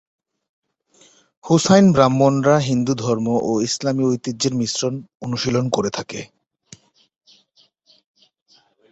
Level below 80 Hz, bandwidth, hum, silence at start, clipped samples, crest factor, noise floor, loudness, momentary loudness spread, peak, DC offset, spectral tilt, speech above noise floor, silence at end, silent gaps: -56 dBFS; 8.2 kHz; none; 1.45 s; under 0.1%; 20 dB; -59 dBFS; -18 LUFS; 13 LU; -2 dBFS; under 0.1%; -5.5 dB/octave; 41 dB; 2.65 s; 5.15-5.20 s